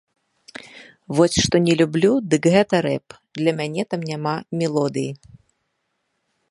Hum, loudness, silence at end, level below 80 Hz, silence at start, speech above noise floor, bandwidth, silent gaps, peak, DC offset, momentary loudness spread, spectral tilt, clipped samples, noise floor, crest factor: none; -20 LUFS; 1.35 s; -50 dBFS; 0.65 s; 54 dB; 11.5 kHz; none; -2 dBFS; under 0.1%; 21 LU; -5.5 dB/octave; under 0.1%; -73 dBFS; 20 dB